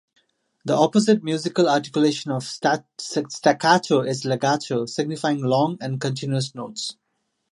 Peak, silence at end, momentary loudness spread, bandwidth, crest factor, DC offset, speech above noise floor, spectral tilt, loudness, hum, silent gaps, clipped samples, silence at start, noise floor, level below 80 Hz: -2 dBFS; 0.6 s; 10 LU; 11.5 kHz; 20 dB; under 0.1%; 53 dB; -5 dB/octave; -22 LUFS; none; none; under 0.1%; 0.65 s; -74 dBFS; -70 dBFS